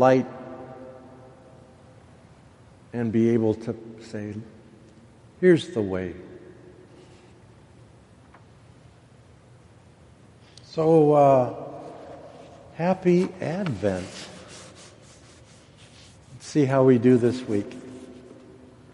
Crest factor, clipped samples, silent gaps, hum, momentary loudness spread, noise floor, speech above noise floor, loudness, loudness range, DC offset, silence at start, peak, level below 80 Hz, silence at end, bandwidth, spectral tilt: 22 dB; under 0.1%; none; none; 26 LU; -52 dBFS; 31 dB; -23 LUFS; 9 LU; under 0.1%; 0 s; -4 dBFS; -62 dBFS; 0.8 s; 11.5 kHz; -7.5 dB/octave